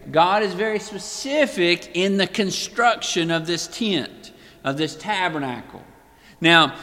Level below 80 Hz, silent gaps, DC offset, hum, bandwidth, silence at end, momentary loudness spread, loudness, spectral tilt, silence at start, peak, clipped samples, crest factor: -58 dBFS; none; under 0.1%; none; 16 kHz; 0 s; 11 LU; -21 LUFS; -3.5 dB/octave; 0 s; 0 dBFS; under 0.1%; 22 dB